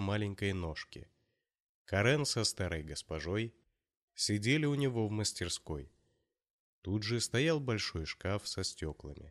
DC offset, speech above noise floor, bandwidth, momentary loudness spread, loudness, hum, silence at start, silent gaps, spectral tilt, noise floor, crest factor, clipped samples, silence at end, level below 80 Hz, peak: under 0.1%; 47 dB; 13.5 kHz; 14 LU; -35 LUFS; none; 0 s; 1.62-1.85 s, 4.02-4.08 s, 6.50-6.82 s; -4.5 dB/octave; -82 dBFS; 18 dB; under 0.1%; 0 s; -56 dBFS; -18 dBFS